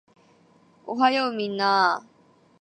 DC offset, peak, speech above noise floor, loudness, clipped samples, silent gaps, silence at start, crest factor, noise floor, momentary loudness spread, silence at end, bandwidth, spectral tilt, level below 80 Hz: under 0.1%; -6 dBFS; 35 dB; -23 LUFS; under 0.1%; none; 0.85 s; 20 dB; -58 dBFS; 13 LU; 0.6 s; 9.4 kHz; -4.5 dB/octave; -80 dBFS